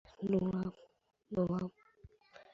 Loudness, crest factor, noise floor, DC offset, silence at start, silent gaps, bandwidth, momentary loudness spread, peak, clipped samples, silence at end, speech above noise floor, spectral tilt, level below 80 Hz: -37 LUFS; 18 dB; -62 dBFS; under 0.1%; 0.2 s; none; 6.8 kHz; 9 LU; -20 dBFS; under 0.1%; 0.1 s; 27 dB; -9.5 dB/octave; -64 dBFS